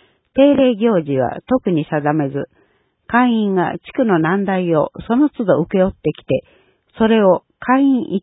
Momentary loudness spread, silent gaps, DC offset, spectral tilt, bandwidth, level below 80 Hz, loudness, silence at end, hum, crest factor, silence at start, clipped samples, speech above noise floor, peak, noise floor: 8 LU; none; under 0.1%; -12.5 dB/octave; 4 kHz; -48 dBFS; -16 LUFS; 0.05 s; none; 16 dB; 0.35 s; under 0.1%; 44 dB; 0 dBFS; -59 dBFS